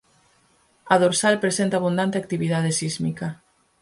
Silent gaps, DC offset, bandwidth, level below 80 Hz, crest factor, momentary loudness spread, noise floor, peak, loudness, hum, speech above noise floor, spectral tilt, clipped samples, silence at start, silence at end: none; under 0.1%; 11.5 kHz; -62 dBFS; 20 dB; 9 LU; -61 dBFS; -4 dBFS; -22 LUFS; none; 40 dB; -4.5 dB/octave; under 0.1%; 0.85 s; 0.45 s